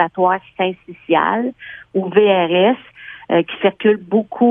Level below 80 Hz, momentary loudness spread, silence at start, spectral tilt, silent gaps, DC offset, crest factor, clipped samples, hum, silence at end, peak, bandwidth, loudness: -64 dBFS; 12 LU; 0 s; -9 dB/octave; none; under 0.1%; 16 dB; under 0.1%; none; 0 s; 0 dBFS; 3.8 kHz; -17 LUFS